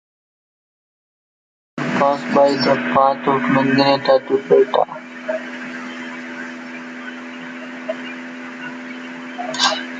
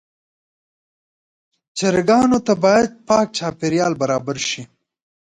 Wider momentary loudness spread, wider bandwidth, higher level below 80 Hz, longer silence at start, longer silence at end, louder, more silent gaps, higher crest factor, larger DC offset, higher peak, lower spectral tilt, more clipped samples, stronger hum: first, 16 LU vs 8 LU; second, 9.2 kHz vs 11 kHz; second, -64 dBFS vs -54 dBFS; about the same, 1.75 s vs 1.75 s; second, 0 s vs 0.65 s; about the same, -18 LUFS vs -18 LUFS; neither; about the same, 18 dB vs 16 dB; neither; about the same, -2 dBFS vs -2 dBFS; about the same, -4.5 dB/octave vs -4.5 dB/octave; neither; neither